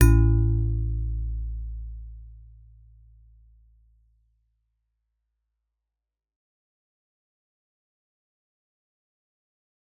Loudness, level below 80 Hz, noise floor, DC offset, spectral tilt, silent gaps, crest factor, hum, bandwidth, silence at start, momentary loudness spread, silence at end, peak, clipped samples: -26 LUFS; -32 dBFS; -88 dBFS; under 0.1%; -9.5 dB/octave; none; 26 dB; none; 4 kHz; 0 s; 23 LU; 7.6 s; -4 dBFS; under 0.1%